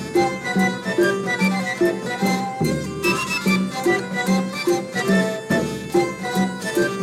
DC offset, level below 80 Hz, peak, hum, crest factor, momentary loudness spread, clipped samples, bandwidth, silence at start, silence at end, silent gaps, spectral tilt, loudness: under 0.1%; -52 dBFS; -6 dBFS; none; 14 dB; 3 LU; under 0.1%; 16 kHz; 0 s; 0 s; none; -5 dB/octave; -21 LUFS